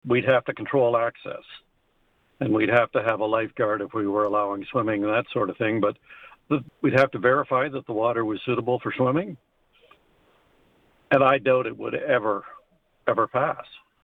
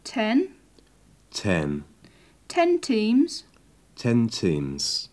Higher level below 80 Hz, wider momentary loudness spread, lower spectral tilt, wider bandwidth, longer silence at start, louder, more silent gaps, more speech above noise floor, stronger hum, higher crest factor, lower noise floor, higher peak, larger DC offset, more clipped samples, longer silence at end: second, -64 dBFS vs -54 dBFS; about the same, 9 LU vs 11 LU; first, -8 dB/octave vs -5 dB/octave; second, 6.2 kHz vs 11 kHz; about the same, 0.05 s vs 0.05 s; about the same, -24 LUFS vs -25 LUFS; neither; first, 43 dB vs 34 dB; neither; about the same, 18 dB vs 16 dB; first, -66 dBFS vs -57 dBFS; about the same, -6 dBFS vs -8 dBFS; neither; neither; first, 0.25 s vs 0.05 s